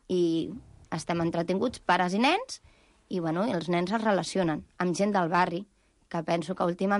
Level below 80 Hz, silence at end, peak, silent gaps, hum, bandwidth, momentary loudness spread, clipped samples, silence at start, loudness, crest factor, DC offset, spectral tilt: -60 dBFS; 0 s; -12 dBFS; none; none; 11.5 kHz; 12 LU; under 0.1%; 0.1 s; -28 LUFS; 16 dB; under 0.1%; -5.5 dB/octave